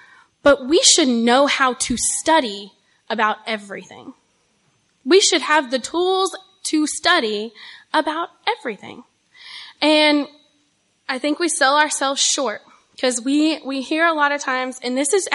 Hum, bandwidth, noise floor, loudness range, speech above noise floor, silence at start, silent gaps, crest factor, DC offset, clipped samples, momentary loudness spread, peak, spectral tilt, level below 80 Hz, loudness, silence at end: none; 11.5 kHz; -64 dBFS; 5 LU; 45 dB; 0.45 s; none; 18 dB; under 0.1%; under 0.1%; 17 LU; 0 dBFS; -1 dB/octave; -56 dBFS; -18 LUFS; 0 s